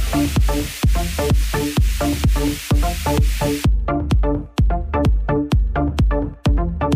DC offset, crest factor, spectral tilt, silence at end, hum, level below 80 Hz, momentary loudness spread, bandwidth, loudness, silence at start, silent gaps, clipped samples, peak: under 0.1%; 12 dB; -6 dB/octave; 0 s; none; -20 dBFS; 2 LU; 16 kHz; -20 LUFS; 0 s; none; under 0.1%; -6 dBFS